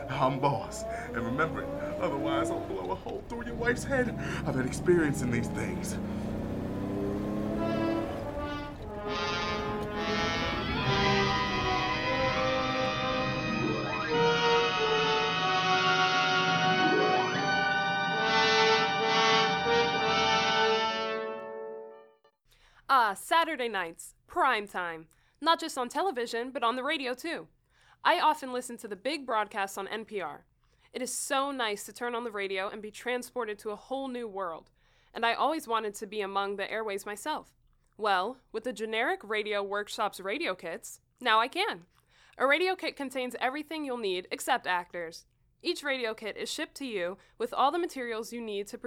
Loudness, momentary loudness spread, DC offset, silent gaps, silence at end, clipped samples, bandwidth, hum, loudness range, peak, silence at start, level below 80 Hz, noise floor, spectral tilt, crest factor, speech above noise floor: -30 LUFS; 12 LU; under 0.1%; none; 0 s; under 0.1%; 17 kHz; none; 8 LU; -10 dBFS; 0 s; -52 dBFS; -65 dBFS; -4 dB/octave; 20 dB; 33 dB